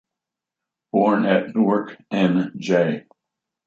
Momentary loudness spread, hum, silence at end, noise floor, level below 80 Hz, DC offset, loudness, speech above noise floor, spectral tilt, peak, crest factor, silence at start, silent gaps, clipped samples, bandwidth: 6 LU; none; 0.65 s; -86 dBFS; -70 dBFS; under 0.1%; -20 LUFS; 66 dB; -7.5 dB/octave; -4 dBFS; 16 dB; 0.95 s; none; under 0.1%; 7.6 kHz